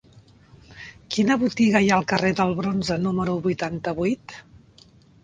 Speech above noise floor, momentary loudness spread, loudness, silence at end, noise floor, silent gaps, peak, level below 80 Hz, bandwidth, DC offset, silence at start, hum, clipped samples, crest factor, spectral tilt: 31 dB; 23 LU; -22 LUFS; 0.85 s; -53 dBFS; none; -4 dBFS; -52 dBFS; 9.4 kHz; under 0.1%; 0.7 s; none; under 0.1%; 20 dB; -5.5 dB/octave